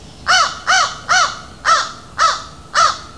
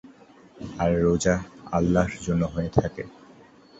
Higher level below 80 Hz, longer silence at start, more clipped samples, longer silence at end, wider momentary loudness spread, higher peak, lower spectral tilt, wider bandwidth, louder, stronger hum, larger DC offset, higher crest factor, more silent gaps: about the same, -46 dBFS vs -42 dBFS; about the same, 0 s vs 0.05 s; neither; second, 0 s vs 0.7 s; second, 7 LU vs 17 LU; about the same, -2 dBFS vs -2 dBFS; second, 0.5 dB/octave vs -6.5 dB/octave; first, 11 kHz vs 8.2 kHz; first, -15 LUFS vs -25 LUFS; neither; first, 0.5% vs under 0.1%; second, 16 dB vs 24 dB; neither